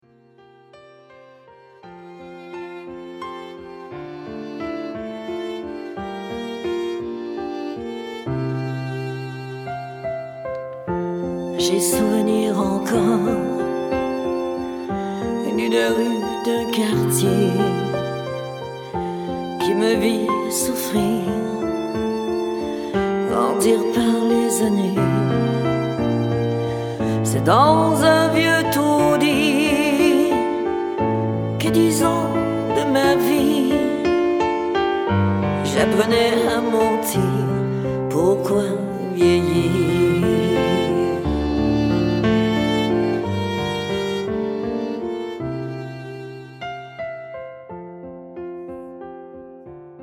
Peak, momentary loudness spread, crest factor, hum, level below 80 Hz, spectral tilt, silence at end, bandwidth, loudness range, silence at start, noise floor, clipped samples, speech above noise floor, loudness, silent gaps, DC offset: -2 dBFS; 16 LU; 18 dB; none; -44 dBFS; -5.5 dB/octave; 0 s; 19.5 kHz; 14 LU; 0.75 s; -51 dBFS; under 0.1%; 34 dB; -20 LUFS; none; under 0.1%